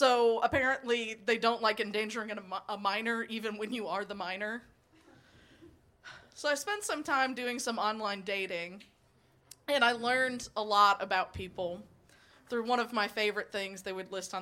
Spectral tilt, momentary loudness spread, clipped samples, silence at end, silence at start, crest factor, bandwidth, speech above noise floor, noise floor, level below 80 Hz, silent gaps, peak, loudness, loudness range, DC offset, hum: -3 dB/octave; 12 LU; under 0.1%; 0 s; 0 s; 22 dB; 16.5 kHz; 34 dB; -67 dBFS; -66 dBFS; none; -12 dBFS; -32 LUFS; 7 LU; under 0.1%; none